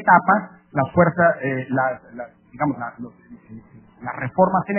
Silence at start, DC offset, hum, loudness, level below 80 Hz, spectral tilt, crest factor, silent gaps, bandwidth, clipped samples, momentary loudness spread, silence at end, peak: 0 s; under 0.1%; none; -20 LUFS; -54 dBFS; -11.5 dB/octave; 20 dB; none; 3.2 kHz; under 0.1%; 21 LU; 0 s; 0 dBFS